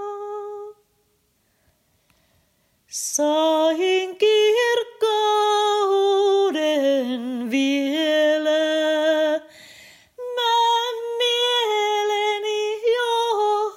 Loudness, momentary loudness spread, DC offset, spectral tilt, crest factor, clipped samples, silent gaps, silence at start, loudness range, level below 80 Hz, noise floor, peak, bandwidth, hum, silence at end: -20 LUFS; 10 LU; under 0.1%; -1 dB/octave; 14 dB; under 0.1%; none; 0 s; 5 LU; -76 dBFS; -66 dBFS; -8 dBFS; 16 kHz; none; 0 s